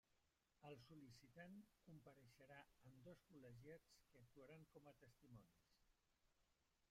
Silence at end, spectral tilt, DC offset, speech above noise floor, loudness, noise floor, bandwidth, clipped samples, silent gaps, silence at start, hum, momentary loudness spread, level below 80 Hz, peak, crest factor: 0 s; -6 dB/octave; under 0.1%; 20 dB; -66 LUFS; -87 dBFS; 15 kHz; under 0.1%; none; 0.05 s; none; 5 LU; -86 dBFS; -50 dBFS; 18 dB